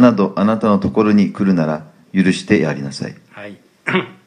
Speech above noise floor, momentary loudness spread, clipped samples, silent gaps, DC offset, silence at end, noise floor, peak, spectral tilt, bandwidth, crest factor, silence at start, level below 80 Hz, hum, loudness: 21 dB; 17 LU; under 0.1%; none; under 0.1%; 0.15 s; -36 dBFS; 0 dBFS; -7 dB/octave; 10 kHz; 16 dB; 0 s; -54 dBFS; none; -16 LUFS